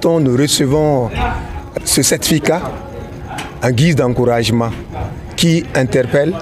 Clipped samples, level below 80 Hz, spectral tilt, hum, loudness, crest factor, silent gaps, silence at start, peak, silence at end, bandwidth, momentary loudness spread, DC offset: under 0.1%; -32 dBFS; -4.5 dB/octave; none; -14 LUFS; 12 dB; none; 0 s; -2 dBFS; 0 s; 16 kHz; 13 LU; under 0.1%